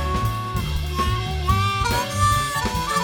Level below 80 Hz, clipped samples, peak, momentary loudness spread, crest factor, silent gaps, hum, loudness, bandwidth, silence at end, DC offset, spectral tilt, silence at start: -30 dBFS; under 0.1%; -6 dBFS; 6 LU; 16 dB; none; none; -22 LUFS; 19 kHz; 0 s; under 0.1%; -4.5 dB/octave; 0 s